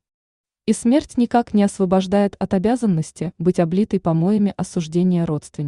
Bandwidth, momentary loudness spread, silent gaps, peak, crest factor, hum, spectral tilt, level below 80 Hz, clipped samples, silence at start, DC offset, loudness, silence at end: 11 kHz; 5 LU; none; -4 dBFS; 14 dB; none; -7 dB/octave; -50 dBFS; under 0.1%; 0.65 s; under 0.1%; -19 LUFS; 0 s